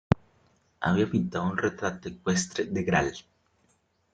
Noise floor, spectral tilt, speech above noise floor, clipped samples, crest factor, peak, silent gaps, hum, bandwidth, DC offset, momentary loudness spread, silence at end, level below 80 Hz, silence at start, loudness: -69 dBFS; -5.5 dB/octave; 42 dB; under 0.1%; 24 dB; -6 dBFS; none; none; 9.4 kHz; under 0.1%; 8 LU; 0.95 s; -52 dBFS; 0.1 s; -28 LUFS